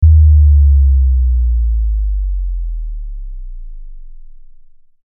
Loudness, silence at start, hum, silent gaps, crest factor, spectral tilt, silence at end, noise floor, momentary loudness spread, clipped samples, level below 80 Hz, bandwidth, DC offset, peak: -13 LUFS; 0 s; none; none; 12 dB; -25.5 dB/octave; 0.75 s; -39 dBFS; 23 LU; under 0.1%; -12 dBFS; 0.2 kHz; under 0.1%; 0 dBFS